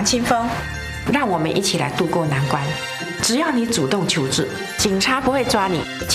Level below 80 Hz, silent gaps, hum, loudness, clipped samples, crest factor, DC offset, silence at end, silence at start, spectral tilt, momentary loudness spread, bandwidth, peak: -42 dBFS; none; none; -20 LUFS; under 0.1%; 16 dB; under 0.1%; 0 s; 0 s; -4 dB/octave; 7 LU; 15.5 kHz; -4 dBFS